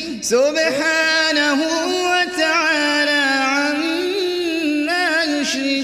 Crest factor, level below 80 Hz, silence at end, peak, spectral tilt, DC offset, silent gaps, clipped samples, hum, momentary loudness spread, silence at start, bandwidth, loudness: 14 dB; -60 dBFS; 0 s; -4 dBFS; -1.5 dB/octave; under 0.1%; none; under 0.1%; none; 5 LU; 0 s; 15.5 kHz; -17 LUFS